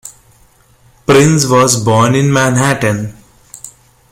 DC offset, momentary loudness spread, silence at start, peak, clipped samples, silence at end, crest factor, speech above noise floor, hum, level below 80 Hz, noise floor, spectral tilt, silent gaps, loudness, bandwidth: under 0.1%; 20 LU; 0.05 s; 0 dBFS; under 0.1%; 0.4 s; 12 dB; 38 dB; none; -44 dBFS; -48 dBFS; -5 dB/octave; none; -11 LUFS; 16.5 kHz